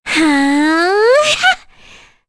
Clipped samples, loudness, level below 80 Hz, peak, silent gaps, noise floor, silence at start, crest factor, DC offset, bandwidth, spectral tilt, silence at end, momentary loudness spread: under 0.1%; -12 LUFS; -48 dBFS; -2 dBFS; none; -42 dBFS; 0.05 s; 12 dB; under 0.1%; 11 kHz; -2 dB/octave; 0.7 s; 3 LU